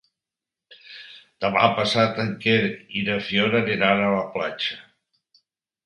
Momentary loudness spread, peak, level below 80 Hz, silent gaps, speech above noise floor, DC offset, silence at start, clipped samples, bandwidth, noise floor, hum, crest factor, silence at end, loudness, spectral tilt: 20 LU; -2 dBFS; -60 dBFS; none; 66 dB; under 0.1%; 0.7 s; under 0.1%; 11 kHz; -88 dBFS; none; 22 dB; 1.05 s; -22 LUFS; -5.5 dB/octave